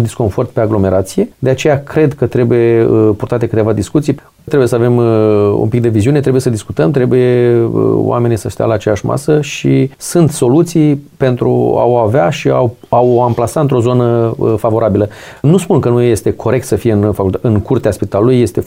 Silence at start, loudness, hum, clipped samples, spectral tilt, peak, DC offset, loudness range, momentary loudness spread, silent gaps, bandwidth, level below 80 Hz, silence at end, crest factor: 0 s; -12 LUFS; none; under 0.1%; -7.5 dB/octave; 0 dBFS; under 0.1%; 1 LU; 5 LU; none; 16 kHz; -42 dBFS; 0 s; 10 dB